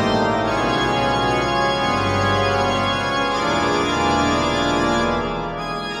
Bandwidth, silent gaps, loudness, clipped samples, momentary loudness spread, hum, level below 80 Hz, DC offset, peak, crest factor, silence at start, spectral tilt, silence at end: 14.5 kHz; none; -19 LUFS; under 0.1%; 4 LU; none; -38 dBFS; under 0.1%; -6 dBFS; 12 dB; 0 s; -4.5 dB/octave; 0 s